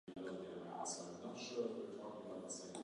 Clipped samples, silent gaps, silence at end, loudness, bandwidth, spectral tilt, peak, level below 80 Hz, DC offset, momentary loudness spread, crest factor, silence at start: under 0.1%; none; 0 s; -48 LUFS; 11 kHz; -3.5 dB/octave; -32 dBFS; -82 dBFS; under 0.1%; 6 LU; 16 dB; 0.05 s